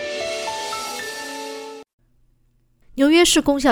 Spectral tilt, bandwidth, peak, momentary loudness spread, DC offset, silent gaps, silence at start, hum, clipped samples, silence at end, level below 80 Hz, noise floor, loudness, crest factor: -2 dB/octave; over 20 kHz; -2 dBFS; 21 LU; under 0.1%; 1.93-1.98 s; 0 s; none; under 0.1%; 0 s; -48 dBFS; -61 dBFS; -20 LUFS; 18 dB